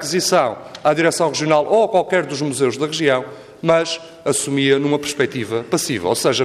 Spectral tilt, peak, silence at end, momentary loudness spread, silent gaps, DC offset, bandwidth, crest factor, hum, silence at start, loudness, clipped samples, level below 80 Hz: -4 dB/octave; -2 dBFS; 0 s; 7 LU; none; under 0.1%; 15 kHz; 16 dB; none; 0 s; -18 LUFS; under 0.1%; -60 dBFS